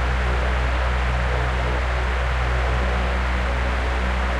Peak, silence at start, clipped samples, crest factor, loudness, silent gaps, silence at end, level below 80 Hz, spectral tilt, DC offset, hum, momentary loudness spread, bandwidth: -10 dBFS; 0 s; under 0.1%; 10 dB; -23 LUFS; none; 0 s; -22 dBFS; -6 dB/octave; under 0.1%; none; 1 LU; 9.6 kHz